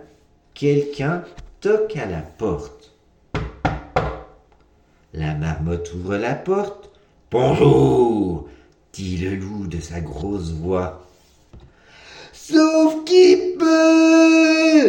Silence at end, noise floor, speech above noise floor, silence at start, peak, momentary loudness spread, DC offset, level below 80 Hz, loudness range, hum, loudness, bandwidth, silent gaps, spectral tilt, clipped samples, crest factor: 0 s; -56 dBFS; 38 dB; 0.55 s; -2 dBFS; 17 LU; under 0.1%; -42 dBFS; 12 LU; none; -18 LUFS; 9.6 kHz; none; -6 dB/octave; under 0.1%; 16 dB